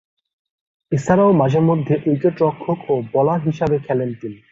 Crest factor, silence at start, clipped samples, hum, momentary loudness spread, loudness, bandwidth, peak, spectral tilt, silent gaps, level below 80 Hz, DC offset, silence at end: 16 dB; 0.9 s; under 0.1%; none; 10 LU; -18 LUFS; 7.8 kHz; -2 dBFS; -8.5 dB/octave; none; -52 dBFS; under 0.1%; 0.15 s